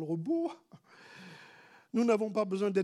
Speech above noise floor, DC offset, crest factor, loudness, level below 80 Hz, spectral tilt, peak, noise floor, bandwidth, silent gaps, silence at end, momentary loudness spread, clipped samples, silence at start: 27 dB; under 0.1%; 16 dB; -32 LUFS; under -90 dBFS; -7 dB/octave; -16 dBFS; -58 dBFS; 12 kHz; none; 0 s; 24 LU; under 0.1%; 0 s